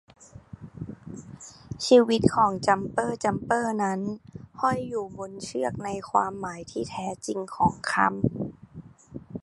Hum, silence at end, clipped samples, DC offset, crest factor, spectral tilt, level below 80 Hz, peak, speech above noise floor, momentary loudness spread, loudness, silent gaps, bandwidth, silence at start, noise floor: none; 0.05 s; under 0.1%; under 0.1%; 22 dB; -5.5 dB/octave; -54 dBFS; -4 dBFS; 21 dB; 23 LU; -26 LUFS; none; 11.5 kHz; 0.2 s; -47 dBFS